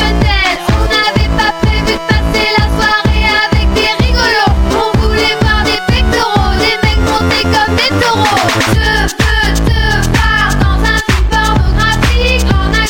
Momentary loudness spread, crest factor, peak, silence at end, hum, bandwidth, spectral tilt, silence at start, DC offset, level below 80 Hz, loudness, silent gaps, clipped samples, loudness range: 2 LU; 10 dB; 0 dBFS; 0 s; none; 18 kHz; -4.5 dB/octave; 0 s; under 0.1%; -14 dBFS; -10 LUFS; none; under 0.1%; 0 LU